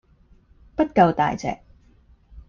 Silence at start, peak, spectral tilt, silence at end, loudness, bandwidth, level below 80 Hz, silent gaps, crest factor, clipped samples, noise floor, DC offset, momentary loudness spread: 0.8 s; -4 dBFS; -7 dB/octave; 0.1 s; -21 LUFS; 7.4 kHz; -48 dBFS; none; 20 dB; under 0.1%; -55 dBFS; under 0.1%; 16 LU